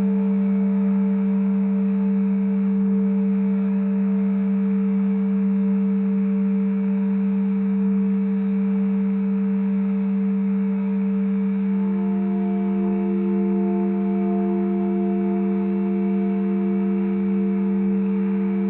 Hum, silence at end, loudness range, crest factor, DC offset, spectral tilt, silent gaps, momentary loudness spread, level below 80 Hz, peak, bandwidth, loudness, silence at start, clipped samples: none; 0 s; 1 LU; 8 dB; under 0.1%; -14 dB/octave; none; 2 LU; -64 dBFS; -12 dBFS; 3 kHz; -21 LUFS; 0 s; under 0.1%